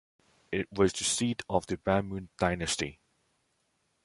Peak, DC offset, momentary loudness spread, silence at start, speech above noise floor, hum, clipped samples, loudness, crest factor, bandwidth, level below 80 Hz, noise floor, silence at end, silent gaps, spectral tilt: -10 dBFS; under 0.1%; 8 LU; 0.5 s; 45 dB; none; under 0.1%; -31 LUFS; 22 dB; 11.5 kHz; -52 dBFS; -75 dBFS; 1.1 s; none; -4 dB/octave